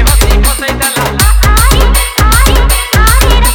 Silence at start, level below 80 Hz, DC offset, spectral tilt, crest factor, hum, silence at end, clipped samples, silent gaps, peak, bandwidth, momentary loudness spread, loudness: 0 s; -8 dBFS; under 0.1%; -3.5 dB/octave; 6 dB; none; 0 s; 0.4%; none; 0 dBFS; 19.5 kHz; 4 LU; -8 LUFS